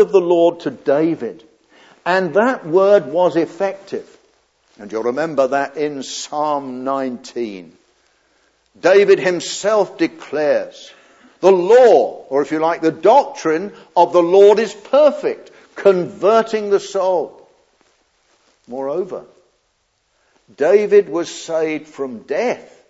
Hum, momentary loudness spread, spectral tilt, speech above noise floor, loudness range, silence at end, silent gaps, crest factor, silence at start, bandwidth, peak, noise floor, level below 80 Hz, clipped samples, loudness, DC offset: none; 15 LU; -5 dB/octave; 50 dB; 8 LU; 0.3 s; none; 16 dB; 0 s; 8 kHz; 0 dBFS; -65 dBFS; -72 dBFS; under 0.1%; -16 LUFS; under 0.1%